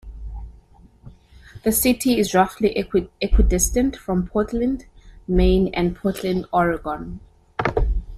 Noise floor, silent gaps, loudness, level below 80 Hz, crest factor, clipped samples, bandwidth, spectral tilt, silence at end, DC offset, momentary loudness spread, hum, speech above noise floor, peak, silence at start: -49 dBFS; none; -21 LUFS; -28 dBFS; 16 dB; under 0.1%; 15.5 kHz; -5 dB/octave; 0 s; under 0.1%; 16 LU; none; 30 dB; -4 dBFS; 0.05 s